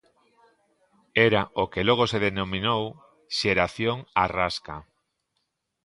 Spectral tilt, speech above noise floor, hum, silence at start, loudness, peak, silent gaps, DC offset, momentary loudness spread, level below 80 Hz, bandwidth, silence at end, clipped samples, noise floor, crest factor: -5 dB/octave; 53 dB; none; 1.15 s; -24 LUFS; -2 dBFS; none; under 0.1%; 10 LU; -52 dBFS; 11.5 kHz; 1 s; under 0.1%; -78 dBFS; 24 dB